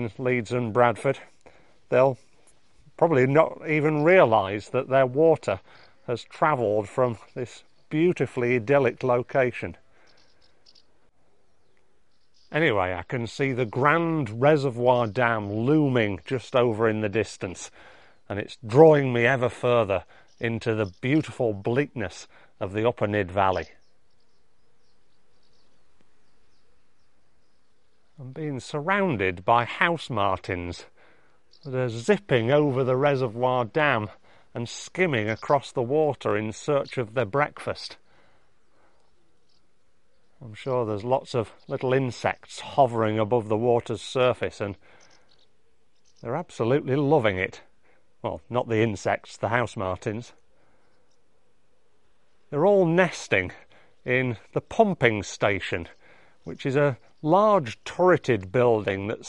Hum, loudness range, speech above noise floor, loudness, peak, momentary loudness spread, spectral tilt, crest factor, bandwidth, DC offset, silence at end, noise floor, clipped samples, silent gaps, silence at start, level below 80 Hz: none; 9 LU; 46 dB; -24 LUFS; -2 dBFS; 14 LU; -6.5 dB/octave; 24 dB; 11 kHz; 0.2%; 0 s; -70 dBFS; under 0.1%; none; 0 s; -60 dBFS